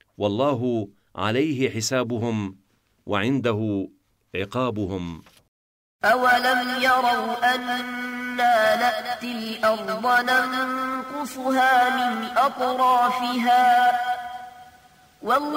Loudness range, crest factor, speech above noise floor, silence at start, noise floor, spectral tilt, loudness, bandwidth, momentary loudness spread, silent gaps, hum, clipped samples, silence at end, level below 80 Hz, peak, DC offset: 6 LU; 16 dB; 31 dB; 0.2 s; -53 dBFS; -4.5 dB/octave; -22 LUFS; 16 kHz; 12 LU; 5.48-5.99 s; none; under 0.1%; 0 s; -62 dBFS; -8 dBFS; under 0.1%